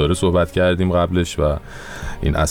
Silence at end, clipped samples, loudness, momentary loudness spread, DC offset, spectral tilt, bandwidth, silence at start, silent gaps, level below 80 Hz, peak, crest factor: 0 s; under 0.1%; -19 LUFS; 14 LU; under 0.1%; -6 dB/octave; 15.5 kHz; 0 s; none; -28 dBFS; -8 dBFS; 10 dB